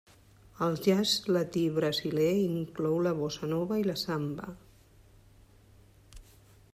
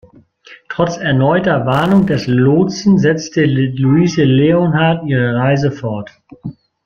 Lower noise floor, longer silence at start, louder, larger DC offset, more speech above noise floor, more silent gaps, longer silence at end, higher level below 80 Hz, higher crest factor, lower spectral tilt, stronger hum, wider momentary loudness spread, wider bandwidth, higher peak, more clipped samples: first, -58 dBFS vs -43 dBFS; about the same, 0.6 s vs 0.5 s; second, -30 LUFS vs -13 LUFS; neither; about the same, 29 dB vs 30 dB; neither; first, 0.5 s vs 0.35 s; second, -60 dBFS vs -46 dBFS; first, 18 dB vs 12 dB; second, -5.5 dB/octave vs -7 dB/octave; neither; second, 7 LU vs 14 LU; first, 15.5 kHz vs 7 kHz; second, -14 dBFS vs -2 dBFS; neither